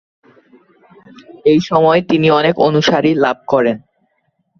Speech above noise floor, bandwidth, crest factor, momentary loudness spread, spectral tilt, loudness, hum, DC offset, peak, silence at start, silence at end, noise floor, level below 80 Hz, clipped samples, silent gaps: 52 dB; 7 kHz; 14 dB; 5 LU; -6.5 dB/octave; -13 LUFS; none; under 0.1%; -2 dBFS; 1.45 s; 0.8 s; -65 dBFS; -56 dBFS; under 0.1%; none